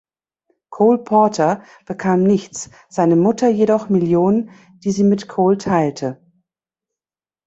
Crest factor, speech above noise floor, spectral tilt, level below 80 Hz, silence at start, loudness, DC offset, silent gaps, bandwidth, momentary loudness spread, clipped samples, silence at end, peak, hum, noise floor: 14 dB; over 74 dB; -7 dB/octave; -58 dBFS; 0.7 s; -17 LUFS; under 0.1%; none; 8 kHz; 13 LU; under 0.1%; 1.3 s; -2 dBFS; none; under -90 dBFS